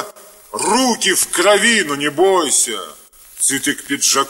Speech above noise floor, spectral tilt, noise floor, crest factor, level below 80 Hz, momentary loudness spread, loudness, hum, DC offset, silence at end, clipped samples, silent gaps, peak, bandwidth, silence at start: 22 dB; -1 dB/octave; -38 dBFS; 16 dB; -58 dBFS; 12 LU; -14 LUFS; none; under 0.1%; 0 s; under 0.1%; none; 0 dBFS; 16.5 kHz; 0 s